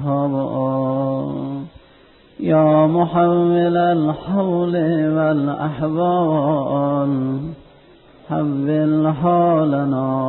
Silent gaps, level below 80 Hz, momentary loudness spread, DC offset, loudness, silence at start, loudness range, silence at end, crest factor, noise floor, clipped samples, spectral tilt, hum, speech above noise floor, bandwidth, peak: none; -52 dBFS; 9 LU; under 0.1%; -18 LUFS; 0 s; 3 LU; 0 s; 14 dB; -49 dBFS; under 0.1%; -13.5 dB/octave; none; 32 dB; 4.2 kHz; -4 dBFS